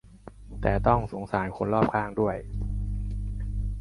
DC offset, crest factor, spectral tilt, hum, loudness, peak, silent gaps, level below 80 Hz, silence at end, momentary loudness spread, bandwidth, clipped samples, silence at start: under 0.1%; 22 dB; -9 dB/octave; 50 Hz at -40 dBFS; -28 LUFS; -6 dBFS; none; -34 dBFS; 0 s; 10 LU; 11 kHz; under 0.1%; 0.05 s